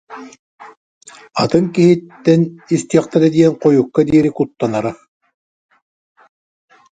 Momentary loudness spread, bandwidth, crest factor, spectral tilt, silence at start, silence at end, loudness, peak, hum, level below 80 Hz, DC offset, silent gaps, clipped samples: 9 LU; 9.2 kHz; 16 dB; -7 dB/octave; 0.1 s; 2 s; -15 LUFS; 0 dBFS; none; -52 dBFS; under 0.1%; 0.39-0.58 s, 0.77-1.01 s; under 0.1%